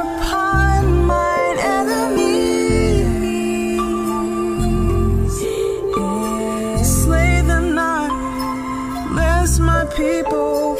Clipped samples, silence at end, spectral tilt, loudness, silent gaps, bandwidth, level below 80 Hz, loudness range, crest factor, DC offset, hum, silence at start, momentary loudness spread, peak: under 0.1%; 0 s; -5.5 dB/octave; -18 LUFS; none; 16 kHz; -22 dBFS; 3 LU; 14 dB; under 0.1%; none; 0 s; 6 LU; -2 dBFS